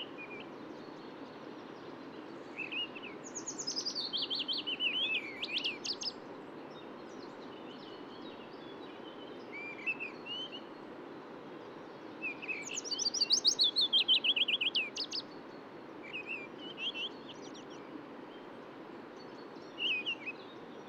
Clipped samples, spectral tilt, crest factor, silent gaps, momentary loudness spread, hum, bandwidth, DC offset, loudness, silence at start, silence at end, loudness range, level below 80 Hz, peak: under 0.1%; -0.5 dB/octave; 22 dB; none; 21 LU; none; 16 kHz; under 0.1%; -33 LUFS; 0 s; 0 s; 14 LU; -84 dBFS; -18 dBFS